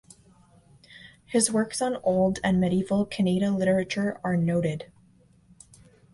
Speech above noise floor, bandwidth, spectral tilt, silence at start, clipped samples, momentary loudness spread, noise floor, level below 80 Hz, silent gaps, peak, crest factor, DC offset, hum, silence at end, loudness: 34 dB; 11.5 kHz; -5.5 dB/octave; 0.9 s; under 0.1%; 5 LU; -59 dBFS; -56 dBFS; none; -8 dBFS; 20 dB; under 0.1%; none; 1.3 s; -25 LUFS